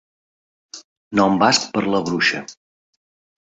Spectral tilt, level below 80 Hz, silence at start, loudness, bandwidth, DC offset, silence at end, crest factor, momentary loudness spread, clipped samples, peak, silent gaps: -3.5 dB/octave; -58 dBFS; 0.75 s; -18 LUFS; 8.2 kHz; under 0.1%; 1.05 s; 20 dB; 24 LU; under 0.1%; -2 dBFS; 0.84-1.11 s